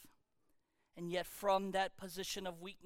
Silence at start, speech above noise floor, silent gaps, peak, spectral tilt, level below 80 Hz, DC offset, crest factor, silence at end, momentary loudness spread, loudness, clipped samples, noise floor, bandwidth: 0 s; 39 dB; none; -22 dBFS; -3.5 dB/octave; -68 dBFS; under 0.1%; 20 dB; 0 s; 11 LU; -40 LUFS; under 0.1%; -79 dBFS; 17.5 kHz